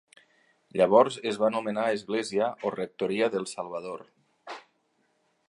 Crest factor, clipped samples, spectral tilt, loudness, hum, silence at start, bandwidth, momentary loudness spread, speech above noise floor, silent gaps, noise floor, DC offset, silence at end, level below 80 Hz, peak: 22 dB; under 0.1%; -5 dB/octave; -27 LUFS; none; 0.75 s; 11 kHz; 21 LU; 45 dB; none; -72 dBFS; under 0.1%; 0.9 s; -74 dBFS; -6 dBFS